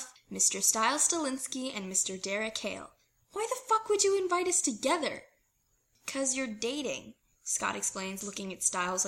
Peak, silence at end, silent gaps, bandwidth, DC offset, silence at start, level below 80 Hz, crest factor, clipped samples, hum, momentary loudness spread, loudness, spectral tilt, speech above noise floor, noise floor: -12 dBFS; 0 s; none; 16.5 kHz; under 0.1%; 0 s; -70 dBFS; 22 dB; under 0.1%; none; 13 LU; -30 LUFS; -1.5 dB/octave; 42 dB; -74 dBFS